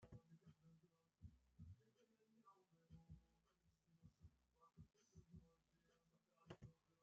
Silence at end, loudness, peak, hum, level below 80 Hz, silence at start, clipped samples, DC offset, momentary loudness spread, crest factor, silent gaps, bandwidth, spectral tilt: 0 s; -68 LUFS; -46 dBFS; none; -80 dBFS; 0 s; under 0.1%; under 0.1%; 4 LU; 24 dB; none; 7.2 kHz; -7 dB/octave